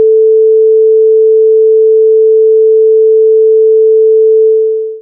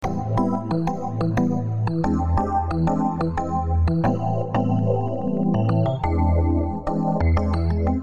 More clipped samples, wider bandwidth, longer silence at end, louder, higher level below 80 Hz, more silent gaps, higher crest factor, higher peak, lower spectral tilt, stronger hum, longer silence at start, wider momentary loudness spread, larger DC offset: neither; second, 0.5 kHz vs 7.4 kHz; about the same, 0 s vs 0 s; first, -6 LUFS vs -22 LUFS; second, under -90 dBFS vs -30 dBFS; neither; second, 4 dB vs 14 dB; first, -2 dBFS vs -8 dBFS; first, -13.5 dB/octave vs -9.5 dB/octave; neither; about the same, 0 s vs 0 s; second, 0 LU vs 4 LU; second, under 0.1% vs 1%